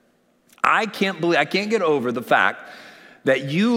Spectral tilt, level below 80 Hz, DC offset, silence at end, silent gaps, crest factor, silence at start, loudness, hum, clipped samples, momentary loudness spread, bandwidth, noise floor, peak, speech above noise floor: -5 dB/octave; -70 dBFS; under 0.1%; 0 s; none; 18 dB; 0.65 s; -20 LUFS; none; under 0.1%; 5 LU; 16.5 kHz; -61 dBFS; -2 dBFS; 41 dB